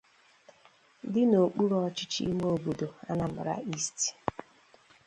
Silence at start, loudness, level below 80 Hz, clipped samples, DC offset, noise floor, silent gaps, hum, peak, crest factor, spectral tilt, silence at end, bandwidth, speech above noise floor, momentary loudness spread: 1.05 s; -30 LUFS; -62 dBFS; under 0.1%; under 0.1%; -62 dBFS; none; none; -10 dBFS; 22 dB; -5 dB/octave; 0.65 s; 10.5 kHz; 32 dB; 12 LU